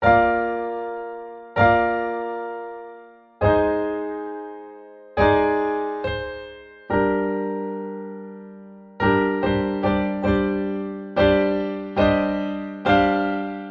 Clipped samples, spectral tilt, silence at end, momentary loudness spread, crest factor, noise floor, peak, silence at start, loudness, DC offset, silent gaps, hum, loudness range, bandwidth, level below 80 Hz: under 0.1%; -8.5 dB/octave; 0 s; 18 LU; 18 dB; -45 dBFS; -4 dBFS; 0 s; -22 LUFS; under 0.1%; none; none; 4 LU; 6.2 kHz; -42 dBFS